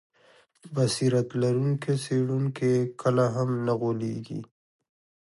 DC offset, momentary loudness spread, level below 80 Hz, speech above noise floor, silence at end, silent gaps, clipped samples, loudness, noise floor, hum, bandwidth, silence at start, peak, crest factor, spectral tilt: under 0.1%; 9 LU; -68 dBFS; 34 dB; 0.85 s; none; under 0.1%; -27 LUFS; -60 dBFS; none; 11.5 kHz; 0.65 s; -10 dBFS; 16 dB; -6.5 dB/octave